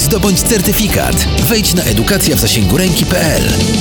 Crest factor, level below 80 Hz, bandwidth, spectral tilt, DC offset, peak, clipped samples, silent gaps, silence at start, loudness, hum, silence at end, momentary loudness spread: 10 dB; -22 dBFS; over 20 kHz; -4 dB/octave; under 0.1%; 0 dBFS; under 0.1%; none; 0 s; -11 LUFS; none; 0 s; 2 LU